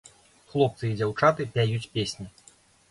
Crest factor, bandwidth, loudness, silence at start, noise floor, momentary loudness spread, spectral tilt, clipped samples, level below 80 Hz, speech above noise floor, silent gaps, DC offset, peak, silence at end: 22 dB; 11.5 kHz; -26 LUFS; 0.55 s; -58 dBFS; 11 LU; -6 dB/octave; under 0.1%; -58 dBFS; 32 dB; none; under 0.1%; -6 dBFS; 0.6 s